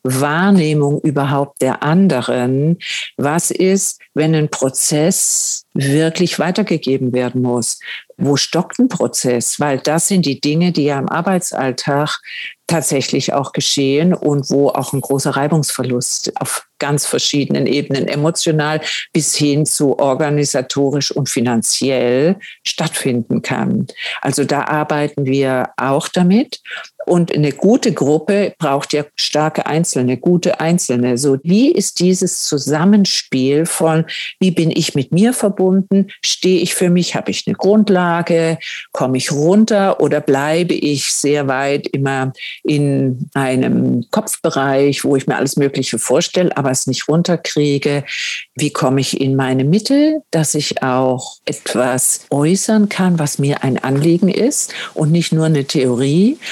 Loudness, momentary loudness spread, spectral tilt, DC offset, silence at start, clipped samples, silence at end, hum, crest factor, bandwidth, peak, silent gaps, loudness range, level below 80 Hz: -15 LUFS; 6 LU; -4.5 dB/octave; under 0.1%; 0.05 s; under 0.1%; 0 s; none; 14 dB; 18 kHz; 0 dBFS; none; 2 LU; -66 dBFS